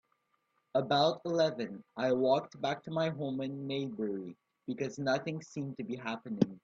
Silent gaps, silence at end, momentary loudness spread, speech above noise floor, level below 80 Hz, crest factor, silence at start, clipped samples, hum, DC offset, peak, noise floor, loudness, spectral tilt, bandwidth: none; 0.05 s; 12 LU; 44 dB; -76 dBFS; 22 dB; 0.75 s; under 0.1%; none; under 0.1%; -12 dBFS; -78 dBFS; -34 LUFS; -6 dB/octave; 7.8 kHz